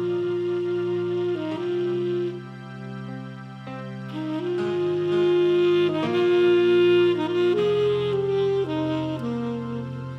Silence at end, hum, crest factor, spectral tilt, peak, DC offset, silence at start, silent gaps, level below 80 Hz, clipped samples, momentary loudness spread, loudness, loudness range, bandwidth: 0 s; none; 12 dB; -7.5 dB/octave; -10 dBFS; under 0.1%; 0 s; none; -64 dBFS; under 0.1%; 17 LU; -23 LUFS; 9 LU; 6.2 kHz